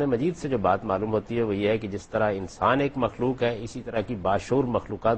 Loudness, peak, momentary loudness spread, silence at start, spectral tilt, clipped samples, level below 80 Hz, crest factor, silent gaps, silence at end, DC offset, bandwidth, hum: -26 LUFS; -8 dBFS; 5 LU; 0 s; -7 dB/octave; under 0.1%; -50 dBFS; 18 dB; none; 0 s; under 0.1%; 8.8 kHz; none